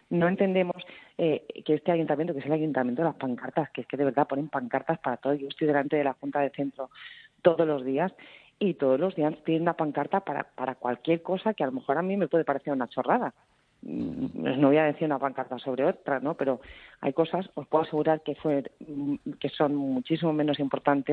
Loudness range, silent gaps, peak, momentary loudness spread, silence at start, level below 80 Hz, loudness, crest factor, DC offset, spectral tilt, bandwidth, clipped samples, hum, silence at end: 2 LU; none; -6 dBFS; 9 LU; 0.1 s; -68 dBFS; -28 LUFS; 20 dB; under 0.1%; -9.5 dB/octave; 4.6 kHz; under 0.1%; none; 0 s